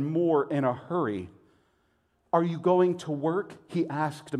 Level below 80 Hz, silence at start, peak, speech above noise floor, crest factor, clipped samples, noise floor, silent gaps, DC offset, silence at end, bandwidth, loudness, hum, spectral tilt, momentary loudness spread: -72 dBFS; 0 s; -10 dBFS; 43 dB; 18 dB; under 0.1%; -70 dBFS; none; under 0.1%; 0 s; 11 kHz; -28 LUFS; none; -8 dB/octave; 9 LU